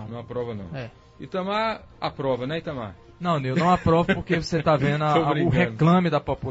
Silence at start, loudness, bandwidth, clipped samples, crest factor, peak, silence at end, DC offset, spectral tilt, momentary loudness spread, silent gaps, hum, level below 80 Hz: 0 s; -23 LUFS; 8 kHz; under 0.1%; 18 dB; -6 dBFS; 0 s; under 0.1%; -7.5 dB/octave; 14 LU; none; none; -46 dBFS